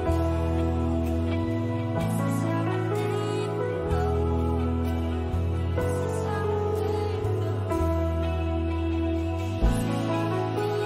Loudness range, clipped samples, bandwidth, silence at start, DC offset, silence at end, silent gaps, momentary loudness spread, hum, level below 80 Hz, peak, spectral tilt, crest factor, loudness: 1 LU; under 0.1%; 14.5 kHz; 0 s; under 0.1%; 0 s; none; 2 LU; none; -36 dBFS; -12 dBFS; -7.5 dB/octave; 14 dB; -27 LUFS